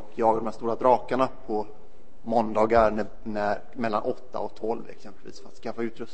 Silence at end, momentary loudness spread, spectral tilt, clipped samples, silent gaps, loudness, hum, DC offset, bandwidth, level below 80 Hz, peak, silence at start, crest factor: 0.1 s; 20 LU; -7 dB/octave; under 0.1%; none; -27 LUFS; none; 3%; 8.6 kHz; -50 dBFS; -6 dBFS; 0 s; 20 dB